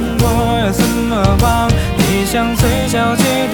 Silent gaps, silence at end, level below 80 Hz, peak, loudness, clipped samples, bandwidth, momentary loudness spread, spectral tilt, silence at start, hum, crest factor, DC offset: none; 0 s; -22 dBFS; 0 dBFS; -14 LUFS; under 0.1%; 19.5 kHz; 2 LU; -5 dB/octave; 0 s; none; 14 dB; under 0.1%